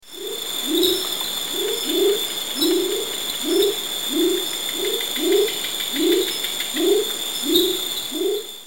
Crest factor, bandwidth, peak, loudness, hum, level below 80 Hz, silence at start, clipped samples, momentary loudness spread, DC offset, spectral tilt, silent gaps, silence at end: 18 dB; 17 kHz; -4 dBFS; -20 LUFS; none; -60 dBFS; 0 s; under 0.1%; 5 LU; 0.7%; -1 dB/octave; none; 0 s